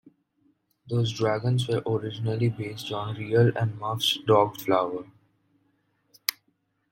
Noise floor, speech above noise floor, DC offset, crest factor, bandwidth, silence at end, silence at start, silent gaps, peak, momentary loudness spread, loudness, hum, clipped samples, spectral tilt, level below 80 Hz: -72 dBFS; 47 dB; under 0.1%; 24 dB; 16.5 kHz; 0.6 s; 0.85 s; none; -2 dBFS; 10 LU; -26 LUFS; none; under 0.1%; -5.5 dB/octave; -64 dBFS